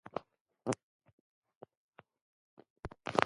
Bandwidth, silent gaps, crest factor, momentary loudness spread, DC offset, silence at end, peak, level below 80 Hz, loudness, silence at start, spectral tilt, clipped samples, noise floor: 11 kHz; 0.41-0.46 s, 0.83-1.00 s, 1.13-1.42 s, 1.56-1.61 s, 1.77-1.93 s, 2.22-2.57 s, 2.70-2.76 s; 36 dB; 25 LU; under 0.1%; 0 s; -6 dBFS; -66 dBFS; -42 LUFS; 0.15 s; -4.5 dB/octave; under 0.1%; -55 dBFS